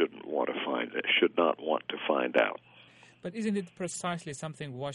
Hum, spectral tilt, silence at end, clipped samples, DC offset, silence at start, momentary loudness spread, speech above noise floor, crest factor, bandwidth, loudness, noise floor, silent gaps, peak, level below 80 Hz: none; -4 dB/octave; 0 s; under 0.1%; under 0.1%; 0 s; 14 LU; 26 dB; 20 dB; 11.5 kHz; -30 LUFS; -57 dBFS; none; -10 dBFS; -74 dBFS